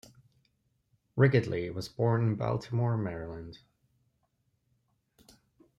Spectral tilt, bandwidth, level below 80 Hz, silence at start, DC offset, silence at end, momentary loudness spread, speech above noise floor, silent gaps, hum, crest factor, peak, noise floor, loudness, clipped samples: -8 dB/octave; 11.5 kHz; -62 dBFS; 1.15 s; under 0.1%; 2.2 s; 16 LU; 47 dB; none; none; 22 dB; -10 dBFS; -76 dBFS; -30 LUFS; under 0.1%